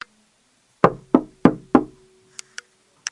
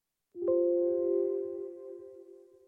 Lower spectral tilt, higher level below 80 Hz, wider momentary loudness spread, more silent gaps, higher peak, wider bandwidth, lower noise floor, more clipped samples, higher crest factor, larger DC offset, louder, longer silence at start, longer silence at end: second, -6 dB/octave vs -10.5 dB/octave; first, -52 dBFS vs -80 dBFS; first, 23 LU vs 20 LU; neither; first, 0 dBFS vs -18 dBFS; first, 11.5 kHz vs 1.7 kHz; first, -62 dBFS vs -54 dBFS; neither; first, 22 dB vs 14 dB; neither; first, -20 LUFS vs -31 LUFS; first, 0.85 s vs 0.35 s; first, 1.25 s vs 0.35 s